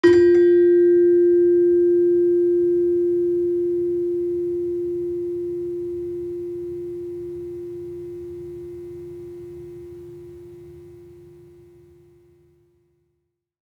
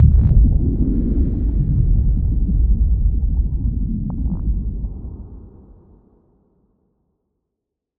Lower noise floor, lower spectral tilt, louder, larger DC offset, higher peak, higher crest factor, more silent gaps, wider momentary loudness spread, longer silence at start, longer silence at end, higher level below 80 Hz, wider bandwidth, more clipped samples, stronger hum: second, -75 dBFS vs -81 dBFS; second, -8 dB/octave vs -14.5 dB/octave; about the same, -19 LUFS vs -20 LUFS; neither; second, -4 dBFS vs 0 dBFS; about the same, 16 dB vs 16 dB; neither; first, 22 LU vs 14 LU; about the same, 0.05 s vs 0 s; about the same, 2.55 s vs 2.5 s; second, -58 dBFS vs -18 dBFS; first, 5.4 kHz vs 1.2 kHz; neither; neither